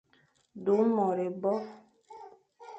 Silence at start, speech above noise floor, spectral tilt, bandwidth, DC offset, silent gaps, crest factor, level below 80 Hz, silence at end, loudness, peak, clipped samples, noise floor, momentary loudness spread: 0.55 s; 40 dB; -9 dB/octave; 8 kHz; under 0.1%; none; 18 dB; -78 dBFS; 0 s; -29 LUFS; -14 dBFS; under 0.1%; -68 dBFS; 24 LU